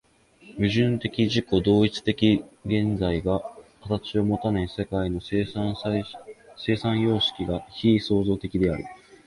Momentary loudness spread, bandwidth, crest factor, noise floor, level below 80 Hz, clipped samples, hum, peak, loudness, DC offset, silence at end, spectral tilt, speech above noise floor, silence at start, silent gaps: 9 LU; 11.5 kHz; 18 dB; -53 dBFS; -44 dBFS; under 0.1%; none; -8 dBFS; -25 LUFS; under 0.1%; 0.3 s; -7 dB/octave; 29 dB; 0.45 s; none